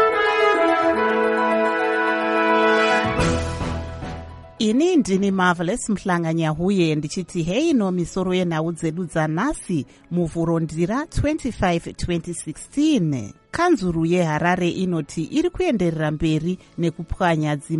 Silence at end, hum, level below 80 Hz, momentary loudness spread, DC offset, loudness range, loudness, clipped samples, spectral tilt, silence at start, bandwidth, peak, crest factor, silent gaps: 0 s; none; -40 dBFS; 9 LU; under 0.1%; 4 LU; -21 LUFS; under 0.1%; -6 dB/octave; 0 s; 11.5 kHz; -6 dBFS; 16 dB; none